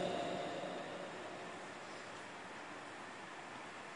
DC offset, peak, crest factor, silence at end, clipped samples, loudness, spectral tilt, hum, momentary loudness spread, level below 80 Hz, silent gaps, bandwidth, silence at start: under 0.1%; -28 dBFS; 18 dB; 0 s; under 0.1%; -47 LUFS; -4 dB/octave; none; 8 LU; -82 dBFS; none; 10.5 kHz; 0 s